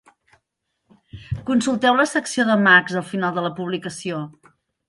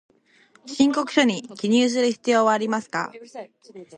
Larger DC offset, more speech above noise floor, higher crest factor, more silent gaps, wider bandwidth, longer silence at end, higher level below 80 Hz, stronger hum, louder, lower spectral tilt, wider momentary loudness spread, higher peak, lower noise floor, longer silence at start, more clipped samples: neither; first, 56 dB vs 35 dB; about the same, 20 dB vs 18 dB; neither; first, 11.5 kHz vs 10 kHz; first, 0.6 s vs 0 s; first, -50 dBFS vs -70 dBFS; neither; about the same, -19 LUFS vs -21 LUFS; about the same, -4.5 dB/octave vs -4 dB/octave; second, 16 LU vs 20 LU; about the same, -2 dBFS vs -4 dBFS; first, -76 dBFS vs -58 dBFS; first, 1.15 s vs 0.65 s; neither